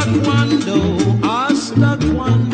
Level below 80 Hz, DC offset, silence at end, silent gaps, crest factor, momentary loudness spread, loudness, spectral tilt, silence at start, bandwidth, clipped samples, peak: -34 dBFS; under 0.1%; 0 s; none; 12 dB; 2 LU; -15 LUFS; -6.5 dB/octave; 0 s; 9.2 kHz; under 0.1%; -2 dBFS